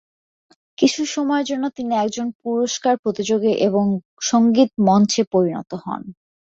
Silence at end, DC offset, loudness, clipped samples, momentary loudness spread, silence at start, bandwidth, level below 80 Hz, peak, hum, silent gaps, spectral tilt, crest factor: 0.45 s; under 0.1%; -19 LUFS; under 0.1%; 12 LU; 0.8 s; 8 kHz; -62 dBFS; -2 dBFS; none; 2.35-2.40 s, 2.99-3.03 s, 4.05-4.17 s, 5.27-5.31 s; -5 dB/octave; 16 dB